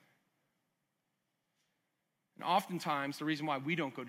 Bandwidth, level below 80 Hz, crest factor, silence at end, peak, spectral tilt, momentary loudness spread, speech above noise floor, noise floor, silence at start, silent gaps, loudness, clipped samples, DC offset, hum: 16 kHz; under -90 dBFS; 22 dB; 0 s; -18 dBFS; -5 dB/octave; 3 LU; 49 dB; -84 dBFS; 2.4 s; none; -36 LUFS; under 0.1%; under 0.1%; none